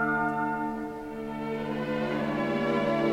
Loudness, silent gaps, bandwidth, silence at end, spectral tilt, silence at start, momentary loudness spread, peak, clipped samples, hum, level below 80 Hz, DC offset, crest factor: -30 LUFS; none; 15.5 kHz; 0 s; -7 dB/octave; 0 s; 9 LU; -14 dBFS; under 0.1%; none; -56 dBFS; under 0.1%; 14 dB